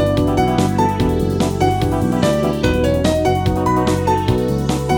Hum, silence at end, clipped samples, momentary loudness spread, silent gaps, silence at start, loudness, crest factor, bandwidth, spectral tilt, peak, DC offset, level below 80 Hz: none; 0 s; under 0.1%; 2 LU; none; 0 s; -17 LUFS; 14 dB; 20 kHz; -6.5 dB/octave; -2 dBFS; under 0.1%; -28 dBFS